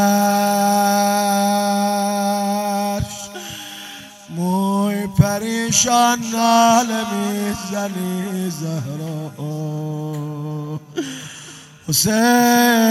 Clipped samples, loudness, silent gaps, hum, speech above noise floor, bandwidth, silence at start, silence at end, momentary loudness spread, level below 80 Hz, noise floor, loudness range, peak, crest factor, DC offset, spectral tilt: under 0.1%; -18 LUFS; none; none; 22 dB; 16 kHz; 0 s; 0 s; 17 LU; -46 dBFS; -39 dBFS; 9 LU; 0 dBFS; 18 dB; under 0.1%; -4 dB/octave